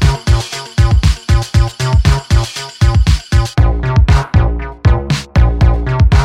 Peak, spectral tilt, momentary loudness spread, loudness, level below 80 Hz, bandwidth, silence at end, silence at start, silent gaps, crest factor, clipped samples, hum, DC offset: 0 dBFS; -6 dB/octave; 4 LU; -13 LUFS; -14 dBFS; 12 kHz; 0 s; 0 s; none; 10 dB; under 0.1%; none; under 0.1%